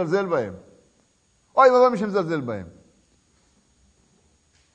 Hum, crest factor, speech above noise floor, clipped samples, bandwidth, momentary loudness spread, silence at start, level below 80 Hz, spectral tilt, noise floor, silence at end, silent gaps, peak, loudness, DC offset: none; 20 dB; 44 dB; under 0.1%; 8.6 kHz; 19 LU; 0 s; -64 dBFS; -6.5 dB/octave; -64 dBFS; 2.05 s; none; -4 dBFS; -21 LUFS; under 0.1%